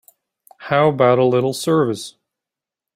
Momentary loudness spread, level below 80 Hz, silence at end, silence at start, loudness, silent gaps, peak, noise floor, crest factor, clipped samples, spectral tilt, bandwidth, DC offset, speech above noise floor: 16 LU; -62 dBFS; 0.85 s; 0.6 s; -17 LUFS; none; -2 dBFS; -87 dBFS; 18 dB; under 0.1%; -6 dB/octave; 16 kHz; under 0.1%; 71 dB